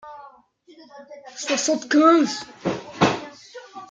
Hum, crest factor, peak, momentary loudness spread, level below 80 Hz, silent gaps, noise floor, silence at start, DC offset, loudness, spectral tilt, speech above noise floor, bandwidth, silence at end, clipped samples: none; 20 dB; -2 dBFS; 26 LU; -64 dBFS; none; -52 dBFS; 0.05 s; under 0.1%; -21 LUFS; -4 dB/octave; 32 dB; 9.4 kHz; 0.05 s; under 0.1%